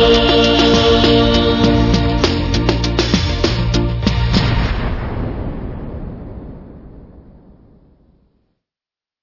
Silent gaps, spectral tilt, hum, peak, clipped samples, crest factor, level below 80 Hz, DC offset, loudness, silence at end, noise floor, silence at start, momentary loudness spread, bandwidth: none; -5.5 dB/octave; none; 0 dBFS; under 0.1%; 16 dB; -24 dBFS; under 0.1%; -14 LUFS; 2.05 s; under -90 dBFS; 0 s; 18 LU; 6 kHz